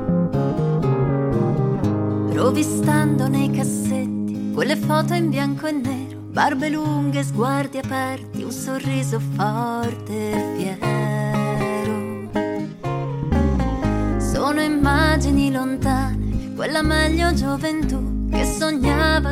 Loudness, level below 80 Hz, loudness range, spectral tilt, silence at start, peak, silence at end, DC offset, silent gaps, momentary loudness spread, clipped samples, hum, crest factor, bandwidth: -21 LUFS; -30 dBFS; 4 LU; -6 dB/octave; 0 s; -4 dBFS; 0 s; 0.1%; none; 7 LU; under 0.1%; none; 18 dB; 16 kHz